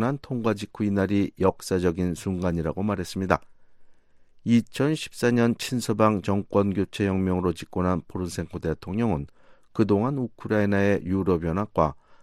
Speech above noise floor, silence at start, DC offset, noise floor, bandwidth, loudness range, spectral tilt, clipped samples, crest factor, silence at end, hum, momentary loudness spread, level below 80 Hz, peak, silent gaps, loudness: 29 dB; 0 s; under 0.1%; -53 dBFS; 15 kHz; 3 LU; -6.5 dB/octave; under 0.1%; 22 dB; 0.1 s; none; 7 LU; -48 dBFS; -2 dBFS; none; -25 LUFS